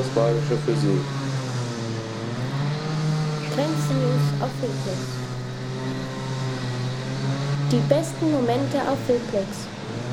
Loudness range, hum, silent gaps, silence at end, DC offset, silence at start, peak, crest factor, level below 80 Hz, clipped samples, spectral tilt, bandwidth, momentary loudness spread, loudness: 3 LU; none; none; 0 s; under 0.1%; 0 s; -4 dBFS; 20 dB; -52 dBFS; under 0.1%; -6.5 dB/octave; 13.5 kHz; 8 LU; -25 LUFS